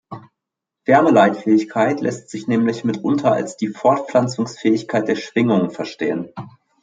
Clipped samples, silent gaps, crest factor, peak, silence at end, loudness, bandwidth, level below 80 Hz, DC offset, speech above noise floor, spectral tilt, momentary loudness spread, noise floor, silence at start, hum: under 0.1%; none; 16 dB; -2 dBFS; 0.35 s; -18 LUFS; 9.2 kHz; -64 dBFS; under 0.1%; 65 dB; -6.5 dB/octave; 13 LU; -83 dBFS; 0.1 s; none